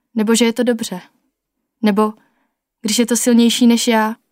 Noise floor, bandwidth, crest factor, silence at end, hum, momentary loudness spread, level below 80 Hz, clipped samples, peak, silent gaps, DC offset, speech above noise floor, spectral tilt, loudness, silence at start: -75 dBFS; 16.5 kHz; 14 dB; 0.2 s; none; 10 LU; -66 dBFS; under 0.1%; -2 dBFS; none; under 0.1%; 60 dB; -3.5 dB/octave; -15 LUFS; 0.15 s